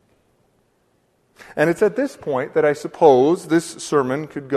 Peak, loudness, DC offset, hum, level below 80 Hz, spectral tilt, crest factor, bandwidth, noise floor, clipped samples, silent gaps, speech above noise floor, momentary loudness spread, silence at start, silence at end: 0 dBFS; -19 LUFS; under 0.1%; none; -62 dBFS; -5.5 dB/octave; 20 dB; 13.5 kHz; -63 dBFS; under 0.1%; none; 45 dB; 11 LU; 1.55 s; 0 s